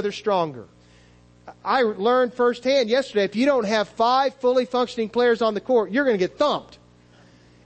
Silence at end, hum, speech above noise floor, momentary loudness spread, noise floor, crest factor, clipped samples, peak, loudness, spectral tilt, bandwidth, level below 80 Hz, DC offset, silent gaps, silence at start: 1 s; 60 Hz at -50 dBFS; 31 dB; 5 LU; -53 dBFS; 14 dB; under 0.1%; -8 dBFS; -21 LUFS; -5 dB/octave; 8.6 kHz; -62 dBFS; under 0.1%; none; 0 s